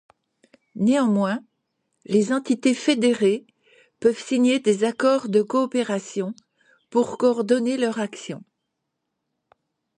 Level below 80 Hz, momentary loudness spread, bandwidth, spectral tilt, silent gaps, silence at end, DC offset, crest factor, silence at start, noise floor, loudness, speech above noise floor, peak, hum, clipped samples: -72 dBFS; 11 LU; 10.5 kHz; -5 dB/octave; none; 1.6 s; under 0.1%; 16 dB; 0.75 s; -79 dBFS; -22 LUFS; 58 dB; -6 dBFS; none; under 0.1%